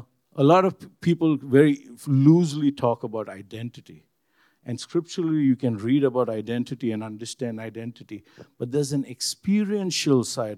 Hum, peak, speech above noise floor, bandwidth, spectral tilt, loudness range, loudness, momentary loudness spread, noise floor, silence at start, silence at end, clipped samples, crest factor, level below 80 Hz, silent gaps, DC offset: none; -4 dBFS; 42 dB; 14 kHz; -6 dB/octave; 7 LU; -23 LUFS; 18 LU; -66 dBFS; 0.35 s; 0 s; under 0.1%; 20 dB; -72 dBFS; none; under 0.1%